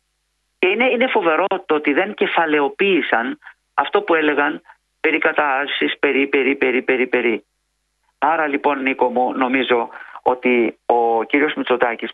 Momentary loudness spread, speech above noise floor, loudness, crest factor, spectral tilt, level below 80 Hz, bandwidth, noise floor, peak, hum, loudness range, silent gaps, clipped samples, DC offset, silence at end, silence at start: 5 LU; 52 dB; -18 LUFS; 18 dB; -6.5 dB/octave; -66 dBFS; 4.7 kHz; -70 dBFS; 0 dBFS; none; 2 LU; none; under 0.1%; under 0.1%; 0 s; 0.6 s